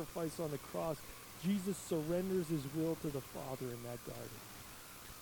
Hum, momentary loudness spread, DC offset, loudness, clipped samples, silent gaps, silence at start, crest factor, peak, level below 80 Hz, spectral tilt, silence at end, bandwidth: none; 13 LU; under 0.1%; -41 LUFS; under 0.1%; none; 0 s; 16 dB; -26 dBFS; -64 dBFS; -5.5 dB/octave; 0 s; 19 kHz